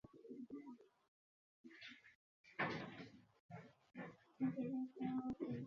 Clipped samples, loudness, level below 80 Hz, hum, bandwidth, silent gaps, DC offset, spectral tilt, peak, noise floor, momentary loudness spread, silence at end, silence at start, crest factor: under 0.1%; -48 LUFS; -80 dBFS; none; 6.8 kHz; 1.08-1.64 s, 2.15-2.44 s, 3.40-3.49 s; under 0.1%; -5 dB/octave; -28 dBFS; under -90 dBFS; 16 LU; 0 s; 0.05 s; 22 dB